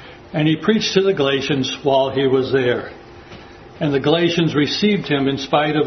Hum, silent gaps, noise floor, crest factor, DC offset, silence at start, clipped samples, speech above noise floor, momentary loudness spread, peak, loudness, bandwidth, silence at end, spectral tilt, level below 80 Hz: none; none; -39 dBFS; 18 dB; under 0.1%; 0 s; under 0.1%; 22 dB; 5 LU; 0 dBFS; -18 LUFS; 6.4 kHz; 0 s; -5.5 dB/octave; -52 dBFS